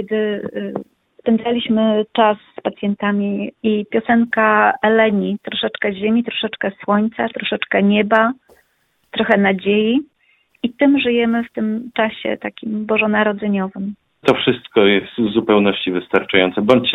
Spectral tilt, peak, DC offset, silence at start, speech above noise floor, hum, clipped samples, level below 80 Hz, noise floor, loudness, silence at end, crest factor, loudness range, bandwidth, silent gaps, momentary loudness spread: -7.5 dB/octave; 0 dBFS; under 0.1%; 0 s; 47 dB; none; under 0.1%; -56 dBFS; -63 dBFS; -17 LUFS; 0 s; 18 dB; 2 LU; 4.8 kHz; none; 10 LU